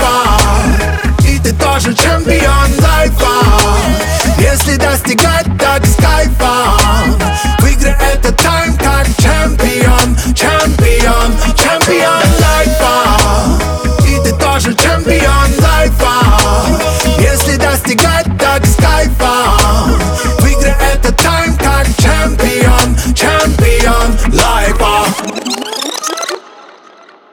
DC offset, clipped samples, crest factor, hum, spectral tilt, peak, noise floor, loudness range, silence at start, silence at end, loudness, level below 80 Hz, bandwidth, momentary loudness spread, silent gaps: under 0.1%; under 0.1%; 8 dB; none; -4.5 dB/octave; 0 dBFS; -39 dBFS; 1 LU; 0 s; 0.95 s; -10 LUFS; -12 dBFS; over 20 kHz; 3 LU; none